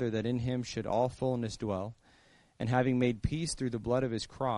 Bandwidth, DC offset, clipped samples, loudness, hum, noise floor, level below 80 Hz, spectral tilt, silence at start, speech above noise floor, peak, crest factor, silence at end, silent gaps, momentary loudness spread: 11 kHz; under 0.1%; under 0.1%; -33 LUFS; none; -64 dBFS; -52 dBFS; -6 dB/octave; 0 s; 32 dB; -14 dBFS; 20 dB; 0 s; none; 7 LU